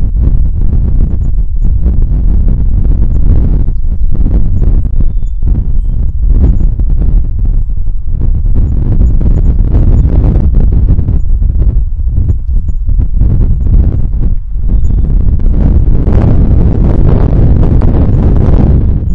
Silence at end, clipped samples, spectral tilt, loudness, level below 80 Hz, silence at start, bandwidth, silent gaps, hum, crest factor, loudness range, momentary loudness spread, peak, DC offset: 0 s; under 0.1%; -11.5 dB/octave; -12 LUFS; -8 dBFS; 0 s; 2.3 kHz; none; none; 6 dB; 4 LU; 6 LU; 0 dBFS; under 0.1%